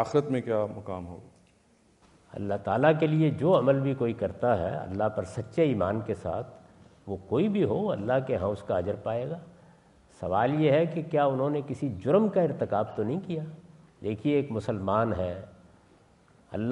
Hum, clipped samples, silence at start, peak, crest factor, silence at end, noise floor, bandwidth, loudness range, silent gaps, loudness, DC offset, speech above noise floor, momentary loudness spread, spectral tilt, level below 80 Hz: none; under 0.1%; 0 s; -8 dBFS; 20 dB; 0 s; -63 dBFS; 10.5 kHz; 4 LU; none; -28 LUFS; under 0.1%; 36 dB; 15 LU; -8.5 dB/octave; -60 dBFS